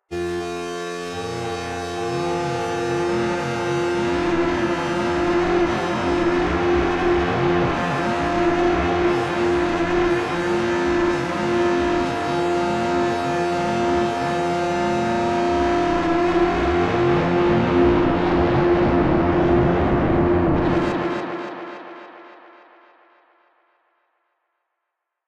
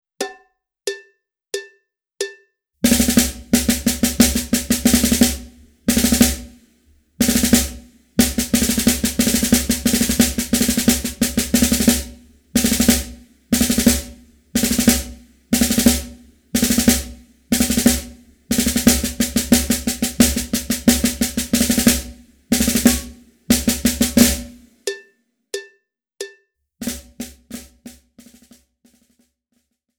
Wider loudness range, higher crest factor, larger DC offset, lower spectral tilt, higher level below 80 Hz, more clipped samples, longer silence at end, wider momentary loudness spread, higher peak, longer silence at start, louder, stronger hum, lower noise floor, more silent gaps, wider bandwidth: second, 6 LU vs 9 LU; second, 14 dB vs 20 dB; neither; first, -6.5 dB/octave vs -3 dB/octave; second, -38 dBFS vs -32 dBFS; neither; first, 2.9 s vs 2.05 s; second, 9 LU vs 17 LU; second, -6 dBFS vs 0 dBFS; about the same, 0.1 s vs 0.2 s; second, -20 LUFS vs -17 LUFS; neither; first, -80 dBFS vs -69 dBFS; neither; second, 10.5 kHz vs over 20 kHz